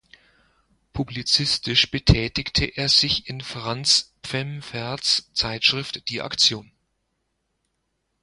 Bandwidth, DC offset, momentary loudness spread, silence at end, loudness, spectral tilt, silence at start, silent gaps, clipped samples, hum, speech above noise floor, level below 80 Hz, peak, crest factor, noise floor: 11.5 kHz; under 0.1%; 13 LU; 1.6 s; -21 LUFS; -3 dB/octave; 0.95 s; none; under 0.1%; none; 52 dB; -40 dBFS; 0 dBFS; 24 dB; -75 dBFS